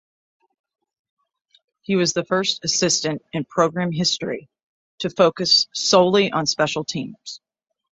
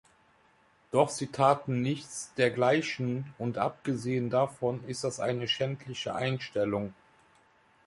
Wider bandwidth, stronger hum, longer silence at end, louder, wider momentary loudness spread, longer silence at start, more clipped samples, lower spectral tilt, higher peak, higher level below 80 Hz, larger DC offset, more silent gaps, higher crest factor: second, 8.2 kHz vs 11.5 kHz; neither; second, 0.55 s vs 0.95 s; first, -19 LUFS vs -30 LUFS; first, 16 LU vs 9 LU; first, 1.9 s vs 0.95 s; neither; second, -3.5 dB/octave vs -5 dB/octave; first, -2 dBFS vs -10 dBFS; about the same, -62 dBFS vs -66 dBFS; neither; first, 4.63-4.98 s vs none; about the same, 20 dB vs 22 dB